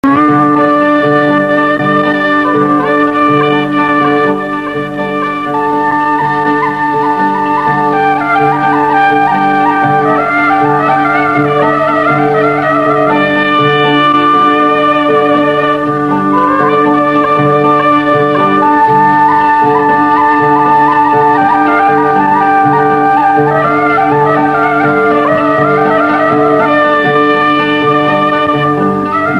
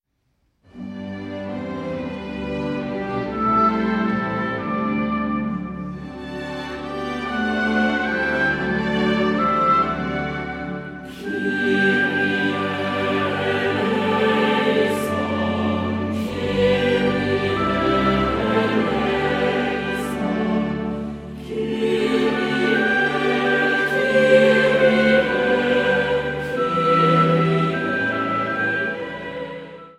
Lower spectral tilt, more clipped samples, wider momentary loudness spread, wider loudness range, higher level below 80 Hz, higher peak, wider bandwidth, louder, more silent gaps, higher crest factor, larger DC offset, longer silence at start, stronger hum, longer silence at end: about the same, -7 dB/octave vs -6.5 dB/octave; neither; second, 3 LU vs 12 LU; second, 3 LU vs 7 LU; about the same, -48 dBFS vs -44 dBFS; about the same, 0 dBFS vs -2 dBFS; second, 9.8 kHz vs 14 kHz; first, -9 LUFS vs -20 LUFS; neither; second, 8 dB vs 18 dB; first, 0.4% vs under 0.1%; second, 0.05 s vs 0.75 s; neither; about the same, 0 s vs 0.05 s